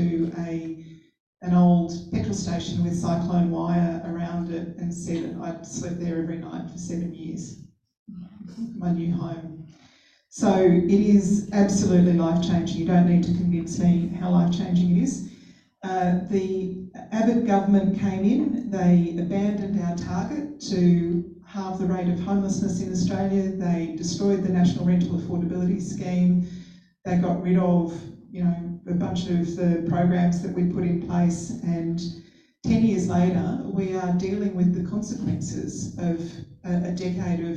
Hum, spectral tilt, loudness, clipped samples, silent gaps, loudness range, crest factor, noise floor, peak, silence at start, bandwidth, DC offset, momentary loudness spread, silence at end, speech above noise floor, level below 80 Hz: none; -7.5 dB/octave; -24 LUFS; under 0.1%; 1.20-1.33 s, 7.99-8.06 s; 9 LU; 16 dB; -57 dBFS; -8 dBFS; 0 s; 8.8 kHz; under 0.1%; 14 LU; 0 s; 34 dB; -50 dBFS